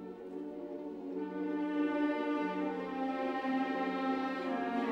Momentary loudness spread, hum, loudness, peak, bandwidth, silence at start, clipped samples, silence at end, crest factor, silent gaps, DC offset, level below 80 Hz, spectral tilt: 10 LU; none; -36 LUFS; -22 dBFS; 7.6 kHz; 0 s; under 0.1%; 0 s; 14 dB; none; under 0.1%; -76 dBFS; -6.5 dB/octave